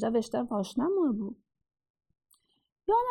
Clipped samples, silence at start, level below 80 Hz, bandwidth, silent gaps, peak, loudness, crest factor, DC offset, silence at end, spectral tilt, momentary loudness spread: under 0.1%; 0 s; -64 dBFS; 13 kHz; 1.90-1.94 s, 2.72-2.76 s; -16 dBFS; -30 LUFS; 16 dB; under 0.1%; 0 s; -6.5 dB/octave; 12 LU